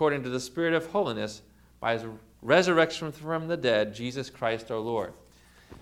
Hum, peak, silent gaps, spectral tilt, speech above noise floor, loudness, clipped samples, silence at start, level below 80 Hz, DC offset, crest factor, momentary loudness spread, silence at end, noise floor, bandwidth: 60 Hz at -55 dBFS; -6 dBFS; none; -5 dB/octave; 28 dB; -28 LUFS; under 0.1%; 0 s; -60 dBFS; under 0.1%; 22 dB; 12 LU; 0.05 s; -55 dBFS; 15.5 kHz